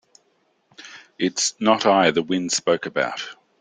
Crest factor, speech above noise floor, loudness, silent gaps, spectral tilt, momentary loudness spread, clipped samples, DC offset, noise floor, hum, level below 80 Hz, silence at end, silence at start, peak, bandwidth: 20 dB; 45 dB; -20 LUFS; none; -3 dB/octave; 21 LU; under 0.1%; under 0.1%; -66 dBFS; none; -66 dBFS; 0.25 s; 0.8 s; -2 dBFS; 10 kHz